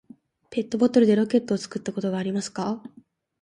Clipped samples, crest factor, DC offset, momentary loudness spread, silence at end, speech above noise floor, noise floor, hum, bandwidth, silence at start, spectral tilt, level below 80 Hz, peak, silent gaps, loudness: under 0.1%; 18 dB; under 0.1%; 12 LU; 0.55 s; 27 dB; -50 dBFS; none; 10.5 kHz; 0.5 s; -6 dB/octave; -66 dBFS; -6 dBFS; none; -24 LUFS